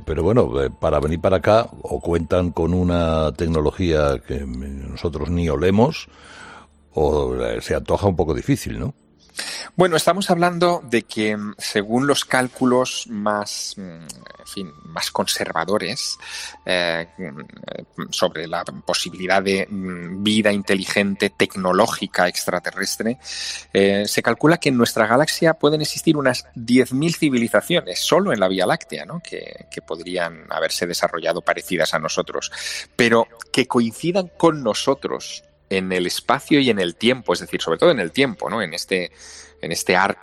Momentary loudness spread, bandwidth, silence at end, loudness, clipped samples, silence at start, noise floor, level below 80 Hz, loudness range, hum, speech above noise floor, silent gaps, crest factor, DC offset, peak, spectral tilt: 14 LU; 16.5 kHz; 0.1 s; -20 LUFS; under 0.1%; 0 s; -44 dBFS; -40 dBFS; 5 LU; none; 24 dB; none; 18 dB; under 0.1%; -2 dBFS; -4.5 dB/octave